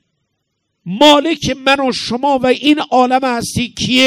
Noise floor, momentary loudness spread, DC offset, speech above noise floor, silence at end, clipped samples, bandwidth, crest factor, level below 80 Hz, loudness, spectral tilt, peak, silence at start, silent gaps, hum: -70 dBFS; 9 LU; under 0.1%; 58 dB; 0 s; 0.6%; 17 kHz; 14 dB; -44 dBFS; -13 LUFS; -4 dB/octave; 0 dBFS; 0.85 s; none; none